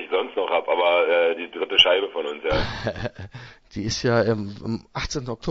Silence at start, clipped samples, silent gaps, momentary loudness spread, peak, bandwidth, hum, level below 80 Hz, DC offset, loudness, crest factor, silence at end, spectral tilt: 0 s; under 0.1%; none; 16 LU; -2 dBFS; 8 kHz; none; -44 dBFS; under 0.1%; -22 LUFS; 22 dB; 0 s; -4 dB/octave